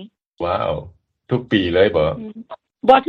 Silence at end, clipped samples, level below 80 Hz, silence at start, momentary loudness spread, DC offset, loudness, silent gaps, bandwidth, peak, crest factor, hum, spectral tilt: 0.05 s; under 0.1%; -44 dBFS; 0 s; 18 LU; under 0.1%; -19 LUFS; 0.26-0.32 s; 6.2 kHz; 0 dBFS; 18 dB; none; -8 dB/octave